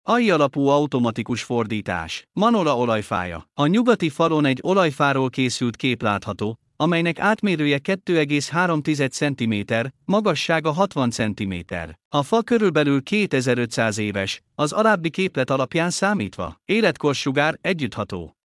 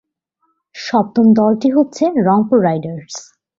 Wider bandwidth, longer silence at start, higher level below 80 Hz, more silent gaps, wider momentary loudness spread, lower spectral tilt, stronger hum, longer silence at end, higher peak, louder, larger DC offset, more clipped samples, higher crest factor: first, 12 kHz vs 7.6 kHz; second, 0.05 s vs 0.75 s; about the same, -58 dBFS vs -58 dBFS; first, 12.05-12.11 s vs none; second, 8 LU vs 17 LU; second, -5.5 dB/octave vs -7 dB/octave; neither; second, 0.2 s vs 0.35 s; about the same, -4 dBFS vs -2 dBFS; second, -21 LUFS vs -14 LUFS; neither; neither; about the same, 16 dB vs 14 dB